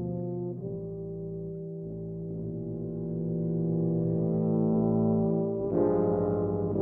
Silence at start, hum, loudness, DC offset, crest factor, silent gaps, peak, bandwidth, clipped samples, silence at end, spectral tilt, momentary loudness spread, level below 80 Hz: 0 s; none; -30 LUFS; under 0.1%; 16 dB; none; -14 dBFS; 2 kHz; under 0.1%; 0 s; -14.5 dB/octave; 12 LU; -54 dBFS